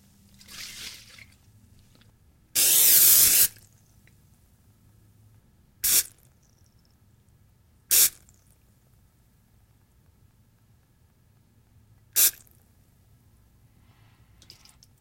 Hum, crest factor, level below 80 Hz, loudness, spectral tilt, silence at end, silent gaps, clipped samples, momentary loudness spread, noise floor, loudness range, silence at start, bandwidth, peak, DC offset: none; 26 dB; -60 dBFS; -18 LUFS; 1.5 dB/octave; 2.7 s; none; under 0.1%; 25 LU; -62 dBFS; 10 LU; 0.6 s; 16.5 kHz; -4 dBFS; under 0.1%